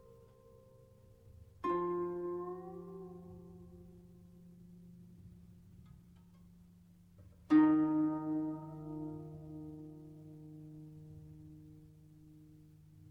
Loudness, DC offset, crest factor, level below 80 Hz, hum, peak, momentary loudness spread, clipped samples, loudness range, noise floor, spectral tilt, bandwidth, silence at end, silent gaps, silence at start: -36 LUFS; under 0.1%; 22 dB; -68 dBFS; none; -18 dBFS; 28 LU; under 0.1%; 23 LU; -62 dBFS; -9 dB/octave; 5 kHz; 0.05 s; none; 0.1 s